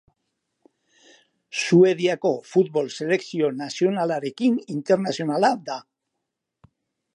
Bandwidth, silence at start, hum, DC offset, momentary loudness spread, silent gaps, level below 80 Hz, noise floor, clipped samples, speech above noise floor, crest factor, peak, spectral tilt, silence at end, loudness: 10.5 kHz; 1.55 s; none; under 0.1%; 10 LU; none; -76 dBFS; -81 dBFS; under 0.1%; 60 dB; 18 dB; -6 dBFS; -5.5 dB/octave; 1.35 s; -22 LUFS